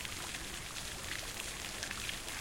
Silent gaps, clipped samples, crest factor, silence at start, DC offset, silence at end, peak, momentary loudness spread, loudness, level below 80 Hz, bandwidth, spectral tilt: none; under 0.1%; 24 dB; 0 s; under 0.1%; 0 s; -18 dBFS; 3 LU; -40 LUFS; -54 dBFS; 17 kHz; -1.5 dB/octave